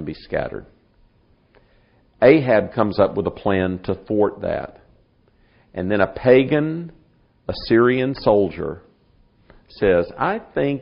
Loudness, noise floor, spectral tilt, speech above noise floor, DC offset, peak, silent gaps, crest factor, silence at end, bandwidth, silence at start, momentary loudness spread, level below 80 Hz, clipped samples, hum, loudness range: -19 LUFS; -58 dBFS; -5.5 dB/octave; 39 dB; under 0.1%; 0 dBFS; none; 20 dB; 0 s; 5.4 kHz; 0 s; 16 LU; -46 dBFS; under 0.1%; none; 3 LU